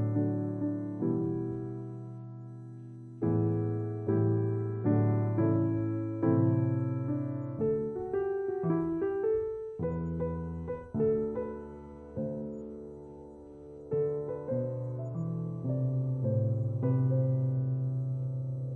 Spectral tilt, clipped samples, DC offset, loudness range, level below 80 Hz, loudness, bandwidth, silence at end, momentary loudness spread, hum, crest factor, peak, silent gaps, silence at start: -12.5 dB/octave; under 0.1%; under 0.1%; 7 LU; -60 dBFS; -32 LUFS; 2.6 kHz; 0 s; 16 LU; none; 16 dB; -16 dBFS; none; 0 s